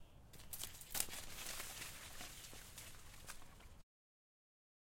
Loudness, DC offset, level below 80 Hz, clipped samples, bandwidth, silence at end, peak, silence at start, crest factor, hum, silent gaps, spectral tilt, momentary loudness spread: -49 LUFS; under 0.1%; -62 dBFS; under 0.1%; 16.5 kHz; 1 s; -16 dBFS; 0 s; 36 dB; none; none; -1 dB/octave; 19 LU